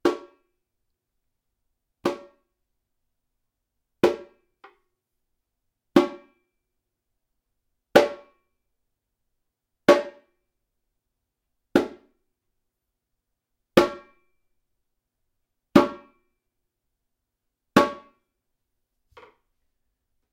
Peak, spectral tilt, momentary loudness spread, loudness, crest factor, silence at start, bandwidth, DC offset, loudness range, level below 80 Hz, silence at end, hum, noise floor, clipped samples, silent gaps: 0 dBFS; -5.5 dB/octave; 18 LU; -23 LUFS; 28 dB; 0.05 s; 16 kHz; under 0.1%; 8 LU; -60 dBFS; 2.4 s; none; -82 dBFS; under 0.1%; none